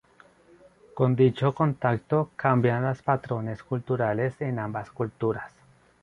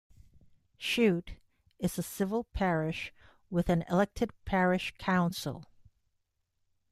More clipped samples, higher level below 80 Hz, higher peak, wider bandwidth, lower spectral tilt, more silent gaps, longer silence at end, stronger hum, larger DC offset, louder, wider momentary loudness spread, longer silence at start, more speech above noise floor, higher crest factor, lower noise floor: neither; second, -60 dBFS vs -52 dBFS; first, -8 dBFS vs -14 dBFS; second, 6.4 kHz vs 14.5 kHz; first, -9.5 dB/octave vs -6 dB/octave; neither; second, 0.55 s vs 1.3 s; neither; neither; first, -26 LUFS vs -31 LUFS; about the same, 11 LU vs 11 LU; first, 0.95 s vs 0.8 s; second, 31 dB vs 48 dB; about the same, 20 dB vs 20 dB; second, -57 dBFS vs -79 dBFS